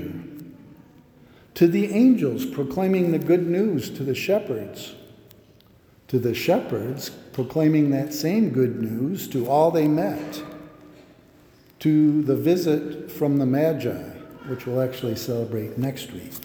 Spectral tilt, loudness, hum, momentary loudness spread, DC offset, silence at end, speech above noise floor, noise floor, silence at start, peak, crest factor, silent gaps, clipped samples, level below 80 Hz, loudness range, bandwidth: -7 dB/octave; -23 LUFS; none; 16 LU; under 0.1%; 0 s; 32 dB; -54 dBFS; 0 s; -6 dBFS; 18 dB; none; under 0.1%; -60 dBFS; 5 LU; over 20 kHz